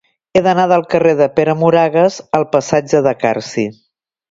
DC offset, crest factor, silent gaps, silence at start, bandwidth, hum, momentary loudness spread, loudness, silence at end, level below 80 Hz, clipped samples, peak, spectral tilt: under 0.1%; 14 dB; none; 0.35 s; 7.8 kHz; none; 6 LU; -14 LUFS; 0.6 s; -52 dBFS; under 0.1%; 0 dBFS; -6 dB/octave